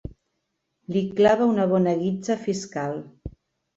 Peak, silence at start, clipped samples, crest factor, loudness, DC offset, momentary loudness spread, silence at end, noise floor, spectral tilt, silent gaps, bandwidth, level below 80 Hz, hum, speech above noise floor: -6 dBFS; 0.05 s; under 0.1%; 18 dB; -23 LUFS; under 0.1%; 23 LU; 0.45 s; -77 dBFS; -6.5 dB/octave; none; 8 kHz; -50 dBFS; none; 55 dB